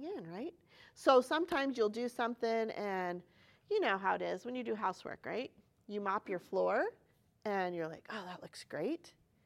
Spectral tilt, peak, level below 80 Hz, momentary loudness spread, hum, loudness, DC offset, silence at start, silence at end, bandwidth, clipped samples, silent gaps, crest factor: -5 dB/octave; -14 dBFS; -80 dBFS; 13 LU; none; -37 LUFS; under 0.1%; 0 s; 0.35 s; 15 kHz; under 0.1%; none; 24 dB